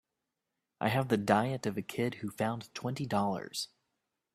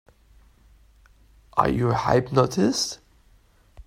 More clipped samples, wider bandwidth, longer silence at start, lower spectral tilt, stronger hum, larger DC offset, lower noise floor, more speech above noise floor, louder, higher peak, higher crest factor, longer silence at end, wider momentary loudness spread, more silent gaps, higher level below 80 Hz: neither; about the same, 15 kHz vs 16 kHz; second, 0.8 s vs 1.55 s; about the same, -5.5 dB/octave vs -5.5 dB/octave; neither; neither; first, -87 dBFS vs -57 dBFS; first, 54 dB vs 36 dB; second, -33 LUFS vs -23 LUFS; second, -10 dBFS vs -4 dBFS; about the same, 24 dB vs 22 dB; first, 0.7 s vs 0.05 s; first, 10 LU vs 7 LU; neither; second, -70 dBFS vs -48 dBFS